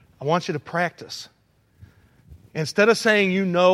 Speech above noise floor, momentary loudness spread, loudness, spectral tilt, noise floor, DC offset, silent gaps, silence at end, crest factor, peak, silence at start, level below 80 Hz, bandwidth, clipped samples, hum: 32 dB; 17 LU; -21 LUFS; -5 dB/octave; -52 dBFS; under 0.1%; none; 0 s; 20 dB; -4 dBFS; 0.2 s; -60 dBFS; 15 kHz; under 0.1%; none